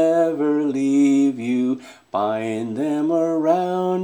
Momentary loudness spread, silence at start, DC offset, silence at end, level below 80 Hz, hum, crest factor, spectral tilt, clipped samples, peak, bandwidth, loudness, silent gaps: 8 LU; 0 s; under 0.1%; 0 s; -72 dBFS; none; 14 dB; -7 dB/octave; under 0.1%; -6 dBFS; 10 kHz; -20 LUFS; none